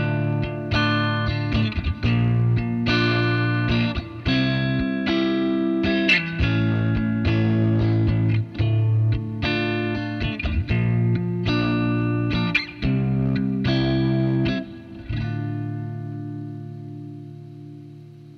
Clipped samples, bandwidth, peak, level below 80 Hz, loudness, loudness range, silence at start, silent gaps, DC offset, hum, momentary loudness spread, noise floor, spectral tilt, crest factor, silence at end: under 0.1%; 6.4 kHz; -8 dBFS; -36 dBFS; -22 LUFS; 5 LU; 0 s; none; under 0.1%; none; 13 LU; -42 dBFS; -8 dB/octave; 14 dB; 0 s